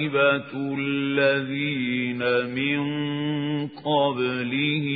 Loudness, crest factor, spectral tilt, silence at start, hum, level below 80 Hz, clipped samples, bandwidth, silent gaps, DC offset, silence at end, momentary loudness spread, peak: -24 LUFS; 16 dB; -10.5 dB/octave; 0 s; none; -68 dBFS; under 0.1%; 4.9 kHz; none; under 0.1%; 0 s; 6 LU; -8 dBFS